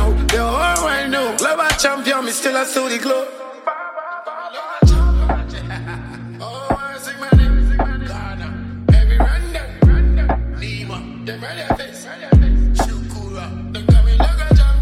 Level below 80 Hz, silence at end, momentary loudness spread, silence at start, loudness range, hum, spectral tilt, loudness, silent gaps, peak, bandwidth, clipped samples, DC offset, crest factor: -18 dBFS; 0 s; 14 LU; 0 s; 3 LU; none; -5 dB/octave; -18 LUFS; none; 0 dBFS; 15 kHz; under 0.1%; under 0.1%; 14 dB